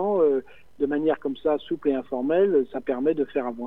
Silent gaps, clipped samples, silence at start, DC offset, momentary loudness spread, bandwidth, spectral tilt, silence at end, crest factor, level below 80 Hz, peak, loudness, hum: none; under 0.1%; 0 s; 0.4%; 6 LU; 4 kHz; -8.5 dB/octave; 0 s; 14 dB; -58 dBFS; -10 dBFS; -25 LUFS; none